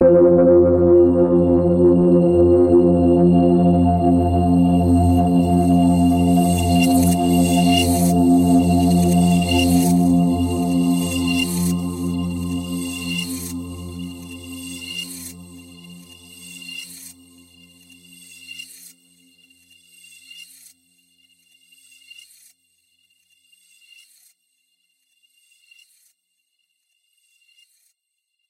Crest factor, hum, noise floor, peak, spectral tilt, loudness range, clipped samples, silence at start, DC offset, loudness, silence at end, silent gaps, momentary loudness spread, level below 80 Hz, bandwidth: 14 dB; none; -76 dBFS; -4 dBFS; -6.5 dB/octave; 22 LU; under 0.1%; 0 s; under 0.1%; -16 LUFS; 8.1 s; none; 19 LU; -40 dBFS; 16 kHz